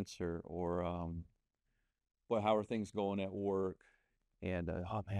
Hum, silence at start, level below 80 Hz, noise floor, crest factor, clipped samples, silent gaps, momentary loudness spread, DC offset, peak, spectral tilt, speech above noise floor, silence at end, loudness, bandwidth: none; 0 s; -62 dBFS; -84 dBFS; 20 dB; under 0.1%; none; 10 LU; under 0.1%; -20 dBFS; -7 dB/octave; 45 dB; 0 s; -39 LUFS; 12 kHz